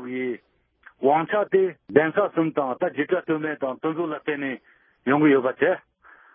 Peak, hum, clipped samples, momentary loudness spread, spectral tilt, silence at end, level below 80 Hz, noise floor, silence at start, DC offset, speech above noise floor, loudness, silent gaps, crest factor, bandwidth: -2 dBFS; none; under 0.1%; 11 LU; -11 dB/octave; 0.55 s; -72 dBFS; -60 dBFS; 0 s; under 0.1%; 38 dB; -23 LUFS; none; 22 dB; 3.7 kHz